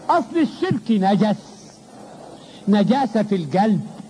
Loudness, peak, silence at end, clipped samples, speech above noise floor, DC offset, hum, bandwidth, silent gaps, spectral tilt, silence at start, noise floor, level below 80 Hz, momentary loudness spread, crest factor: -20 LUFS; -6 dBFS; 0 s; under 0.1%; 24 dB; under 0.1%; none; 10.5 kHz; none; -7.5 dB/octave; 0 s; -42 dBFS; -64 dBFS; 22 LU; 14 dB